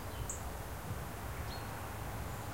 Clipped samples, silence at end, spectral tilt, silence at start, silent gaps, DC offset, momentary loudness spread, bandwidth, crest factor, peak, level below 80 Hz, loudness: under 0.1%; 0 s; -4.5 dB/octave; 0 s; none; 0.2%; 2 LU; 16 kHz; 16 dB; -26 dBFS; -48 dBFS; -43 LUFS